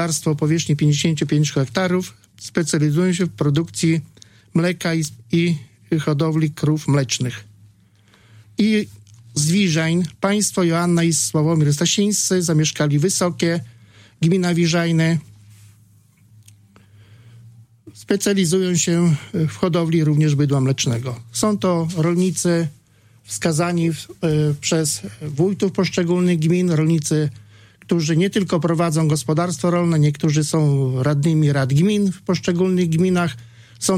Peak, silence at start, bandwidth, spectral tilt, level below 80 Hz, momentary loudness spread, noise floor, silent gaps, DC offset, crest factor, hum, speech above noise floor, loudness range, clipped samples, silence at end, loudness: -4 dBFS; 0 s; 15.5 kHz; -5.5 dB/octave; -56 dBFS; 6 LU; -54 dBFS; none; under 0.1%; 16 dB; none; 35 dB; 4 LU; under 0.1%; 0 s; -19 LUFS